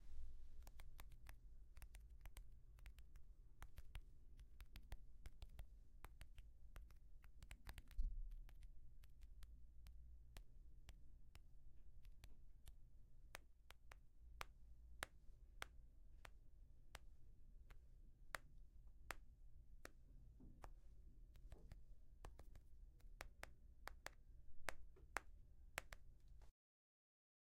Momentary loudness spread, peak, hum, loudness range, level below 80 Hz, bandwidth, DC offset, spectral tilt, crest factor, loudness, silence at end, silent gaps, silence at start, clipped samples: 13 LU; -24 dBFS; none; 9 LU; -60 dBFS; 15.5 kHz; under 0.1%; -3.5 dB/octave; 34 dB; -62 LUFS; 1 s; none; 0 s; under 0.1%